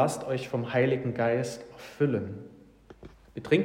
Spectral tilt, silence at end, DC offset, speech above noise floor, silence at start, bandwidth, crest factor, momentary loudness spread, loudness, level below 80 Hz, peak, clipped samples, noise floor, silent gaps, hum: -6.5 dB/octave; 0 s; under 0.1%; 25 dB; 0 s; 16 kHz; 20 dB; 18 LU; -29 LUFS; -62 dBFS; -10 dBFS; under 0.1%; -53 dBFS; none; none